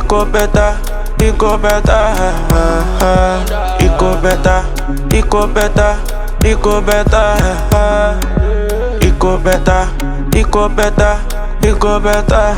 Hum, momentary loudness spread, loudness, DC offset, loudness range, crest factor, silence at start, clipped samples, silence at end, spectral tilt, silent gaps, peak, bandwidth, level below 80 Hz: none; 5 LU; -13 LUFS; under 0.1%; 1 LU; 10 dB; 0 s; under 0.1%; 0 s; -5.5 dB/octave; none; 0 dBFS; 17.5 kHz; -14 dBFS